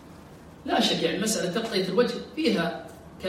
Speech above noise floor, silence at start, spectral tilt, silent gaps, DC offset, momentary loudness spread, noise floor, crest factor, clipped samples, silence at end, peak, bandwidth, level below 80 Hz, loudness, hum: 21 dB; 0 s; -4 dB/octave; none; under 0.1%; 12 LU; -47 dBFS; 18 dB; under 0.1%; 0 s; -10 dBFS; 16 kHz; -58 dBFS; -26 LUFS; none